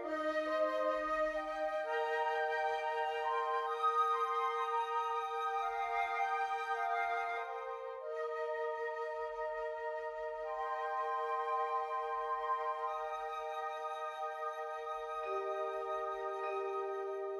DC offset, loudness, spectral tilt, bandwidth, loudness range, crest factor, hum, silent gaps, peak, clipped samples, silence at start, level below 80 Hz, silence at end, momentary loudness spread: under 0.1%; -37 LUFS; -2.5 dB/octave; 13.5 kHz; 5 LU; 14 dB; none; none; -24 dBFS; under 0.1%; 0 s; -72 dBFS; 0 s; 7 LU